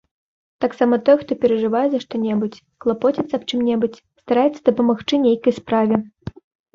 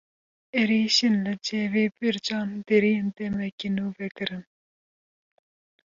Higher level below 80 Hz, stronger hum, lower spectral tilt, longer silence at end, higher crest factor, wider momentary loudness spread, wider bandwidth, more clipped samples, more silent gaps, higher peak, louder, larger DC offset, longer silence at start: first, -56 dBFS vs -64 dBFS; neither; first, -6.5 dB/octave vs -4.5 dB/octave; second, 0.45 s vs 1.45 s; about the same, 18 dB vs 18 dB; second, 8 LU vs 11 LU; about the same, 7.4 kHz vs 7.6 kHz; neither; second, none vs 3.52-3.58 s, 4.11-4.15 s; first, -2 dBFS vs -8 dBFS; first, -19 LUFS vs -25 LUFS; neither; about the same, 0.6 s vs 0.55 s